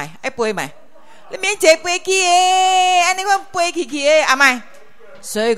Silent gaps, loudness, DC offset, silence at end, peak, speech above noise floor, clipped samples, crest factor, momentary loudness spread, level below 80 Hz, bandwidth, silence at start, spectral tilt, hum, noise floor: none; -15 LUFS; 1%; 0 s; 0 dBFS; 29 dB; under 0.1%; 16 dB; 13 LU; -60 dBFS; 16 kHz; 0 s; -1 dB/octave; none; -44 dBFS